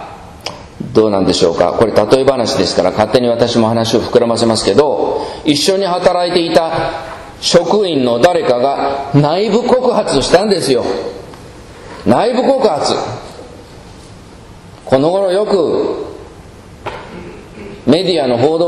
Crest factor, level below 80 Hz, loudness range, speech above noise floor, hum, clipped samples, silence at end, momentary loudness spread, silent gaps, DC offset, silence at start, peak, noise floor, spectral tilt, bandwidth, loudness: 14 dB; -42 dBFS; 5 LU; 24 dB; none; 0.3%; 0 s; 17 LU; none; under 0.1%; 0 s; 0 dBFS; -35 dBFS; -5 dB/octave; 12.5 kHz; -13 LUFS